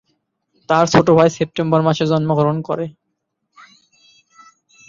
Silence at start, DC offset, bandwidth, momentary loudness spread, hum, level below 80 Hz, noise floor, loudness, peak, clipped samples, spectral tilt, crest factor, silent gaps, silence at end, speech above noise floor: 0.7 s; under 0.1%; 7.6 kHz; 11 LU; none; -54 dBFS; -74 dBFS; -16 LUFS; 0 dBFS; under 0.1%; -6.5 dB/octave; 18 dB; none; 2 s; 59 dB